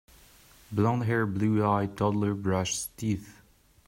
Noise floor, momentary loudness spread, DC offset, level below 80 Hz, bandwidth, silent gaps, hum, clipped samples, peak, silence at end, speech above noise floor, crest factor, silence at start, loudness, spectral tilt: -56 dBFS; 7 LU; under 0.1%; -58 dBFS; 16 kHz; none; none; under 0.1%; -12 dBFS; 0.55 s; 29 dB; 18 dB; 0.7 s; -28 LUFS; -6 dB/octave